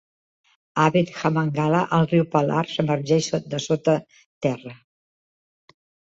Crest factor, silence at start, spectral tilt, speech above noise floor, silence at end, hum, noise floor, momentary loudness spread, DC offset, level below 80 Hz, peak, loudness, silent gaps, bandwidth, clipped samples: 18 dB; 0.75 s; -6 dB/octave; over 69 dB; 1.4 s; none; under -90 dBFS; 7 LU; under 0.1%; -62 dBFS; -4 dBFS; -22 LUFS; 4.26-4.41 s; 8 kHz; under 0.1%